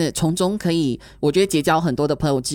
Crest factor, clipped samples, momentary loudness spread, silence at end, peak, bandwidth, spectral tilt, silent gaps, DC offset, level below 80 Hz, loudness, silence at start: 14 dB; under 0.1%; 4 LU; 0 s; -6 dBFS; 18 kHz; -5.5 dB/octave; none; under 0.1%; -44 dBFS; -20 LUFS; 0 s